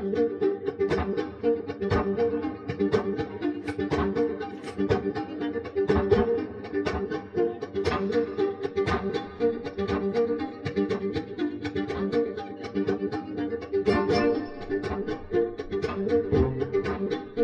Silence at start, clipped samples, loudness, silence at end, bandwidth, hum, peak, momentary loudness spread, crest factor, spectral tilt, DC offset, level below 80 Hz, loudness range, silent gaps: 0 s; under 0.1%; -28 LUFS; 0 s; 9 kHz; none; -8 dBFS; 7 LU; 18 dB; -7.5 dB/octave; under 0.1%; -46 dBFS; 2 LU; none